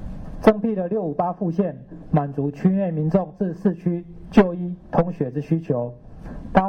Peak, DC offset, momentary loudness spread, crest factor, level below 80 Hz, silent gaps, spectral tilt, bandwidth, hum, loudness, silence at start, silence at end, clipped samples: -4 dBFS; under 0.1%; 12 LU; 18 dB; -42 dBFS; none; -9.5 dB/octave; 6.4 kHz; none; -23 LUFS; 0 s; 0 s; under 0.1%